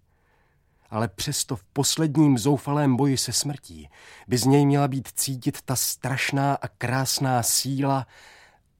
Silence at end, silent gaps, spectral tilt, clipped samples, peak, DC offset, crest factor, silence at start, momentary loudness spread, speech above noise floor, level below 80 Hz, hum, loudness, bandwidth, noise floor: 0.75 s; none; -4.5 dB/octave; under 0.1%; -6 dBFS; under 0.1%; 18 dB; 0.9 s; 9 LU; 40 dB; -58 dBFS; none; -23 LUFS; 16.5 kHz; -64 dBFS